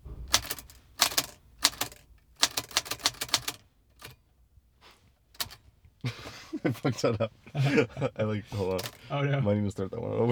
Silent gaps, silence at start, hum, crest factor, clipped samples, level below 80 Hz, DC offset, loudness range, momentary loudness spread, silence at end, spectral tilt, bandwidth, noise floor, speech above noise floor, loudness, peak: none; 0.05 s; none; 32 dB; under 0.1%; -56 dBFS; under 0.1%; 8 LU; 14 LU; 0 s; -3.5 dB/octave; over 20 kHz; -62 dBFS; 33 dB; -30 LUFS; 0 dBFS